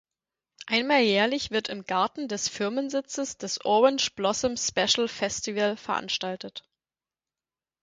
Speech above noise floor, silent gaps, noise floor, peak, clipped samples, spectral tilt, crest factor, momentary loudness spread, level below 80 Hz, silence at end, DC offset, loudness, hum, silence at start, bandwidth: over 63 dB; none; under -90 dBFS; -8 dBFS; under 0.1%; -2.5 dB/octave; 20 dB; 10 LU; -64 dBFS; 1.25 s; under 0.1%; -26 LUFS; none; 0.6 s; 9.6 kHz